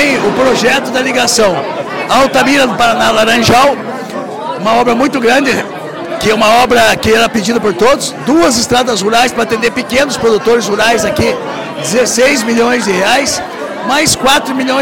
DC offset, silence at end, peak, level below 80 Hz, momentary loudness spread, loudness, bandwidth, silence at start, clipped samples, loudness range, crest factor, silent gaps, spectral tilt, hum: 0.9%; 0 s; 0 dBFS; -38 dBFS; 10 LU; -10 LUFS; 17 kHz; 0 s; under 0.1%; 2 LU; 10 dB; none; -3 dB/octave; none